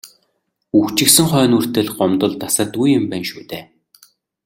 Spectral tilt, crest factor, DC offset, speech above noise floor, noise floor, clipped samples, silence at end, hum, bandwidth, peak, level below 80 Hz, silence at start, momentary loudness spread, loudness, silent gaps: -4 dB/octave; 18 dB; under 0.1%; 53 dB; -69 dBFS; under 0.1%; 0.8 s; none; 17 kHz; 0 dBFS; -54 dBFS; 0.05 s; 15 LU; -15 LUFS; none